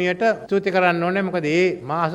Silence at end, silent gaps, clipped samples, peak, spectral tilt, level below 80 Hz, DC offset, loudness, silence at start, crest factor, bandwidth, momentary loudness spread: 0 s; none; under 0.1%; -4 dBFS; -6.5 dB/octave; -60 dBFS; under 0.1%; -20 LUFS; 0 s; 16 dB; 10.5 kHz; 4 LU